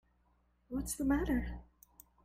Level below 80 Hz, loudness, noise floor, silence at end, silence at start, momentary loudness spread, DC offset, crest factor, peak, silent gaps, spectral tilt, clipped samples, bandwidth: -48 dBFS; -36 LUFS; -73 dBFS; 0.6 s; 0.7 s; 13 LU; under 0.1%; 18 dB; -20 dBFS; none; -5.5 dB/octave; under 0.1%; 16 kHz